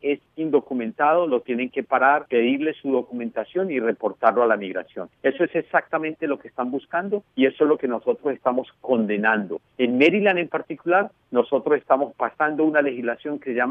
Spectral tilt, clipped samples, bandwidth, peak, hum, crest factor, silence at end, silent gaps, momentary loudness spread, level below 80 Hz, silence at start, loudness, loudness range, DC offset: -7.5 dB/octave; under 0.1%; 5.8 kHz; -4 dBFS; none; 18 dB; 0 s; none; 9 LU; -72 dBFS; 0.05 s; -22 LUFS; 3 LU; under 0.1%